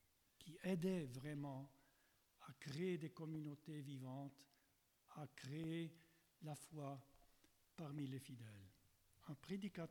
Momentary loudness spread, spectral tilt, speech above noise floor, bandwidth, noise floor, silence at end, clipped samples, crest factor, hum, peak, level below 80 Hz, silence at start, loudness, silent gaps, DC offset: 17 LU; -6.5 dB/octave; 31 dB; 19 kHz; -81 dBFS; 0 s; under 0.1%; 20 dB; none; -32 dBFS; -82 dBFS; 0.4 s; -51 LUFS; none; under 0.1%